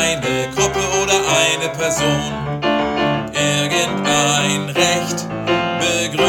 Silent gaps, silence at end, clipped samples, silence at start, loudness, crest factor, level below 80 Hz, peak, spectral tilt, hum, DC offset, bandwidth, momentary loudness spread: none; 0 s; under 0.1%; 0 s; -17 LUFS; 18 dB; -44 dBFS; 0 dBFS; -3 dB/octave; none; under 0.1%; over 20 kHz; 5 LU